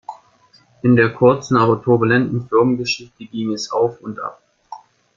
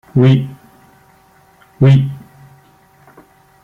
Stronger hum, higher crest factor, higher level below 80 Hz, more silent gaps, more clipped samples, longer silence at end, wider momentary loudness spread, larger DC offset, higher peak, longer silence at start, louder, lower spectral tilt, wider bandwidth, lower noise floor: neither; about the same, 18 dB vs 14 dB; about the same, -54 dBFS vs -50 dBFS; neither; neither; second, 0.4 s vs 1.45 s; about the same, 15 LU vs 17 LU; neither; about the same, -2 dBFS vs -2 dBFS; about the same, 0.1 s vs 0.15 s; second, -17 LUFS vs -13 LUFS; second, -6.5 dB/octave vs -9 dB/octave; first, 7.4 kHz vs 4.5 kHz; first, -54 dBFS vs -49 dBFS